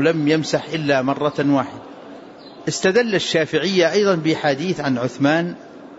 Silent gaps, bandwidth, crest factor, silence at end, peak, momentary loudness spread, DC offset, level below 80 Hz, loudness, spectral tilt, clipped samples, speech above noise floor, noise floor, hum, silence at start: none; 8 kHz; 14 dB; 0 s; -4 dBFS; 17 LU; under 0.1%; -62 dBFS; -19 LUFS; -5 dB/octave; under 0.1%; 21 dB; -39 dBFS; none; 0 s